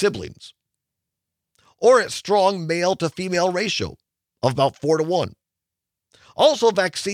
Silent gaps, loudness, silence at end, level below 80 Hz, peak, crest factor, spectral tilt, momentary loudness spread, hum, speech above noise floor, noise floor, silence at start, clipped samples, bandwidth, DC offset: none; -20 LUFS; 0 s; -60 dBFS; -4 dBFS; 18 dB; -4.5 dB/octave; 11 LU; none; 65 dB; -85 dBFS; 0 s; under 0.1%; 15 kHz; under 0.1%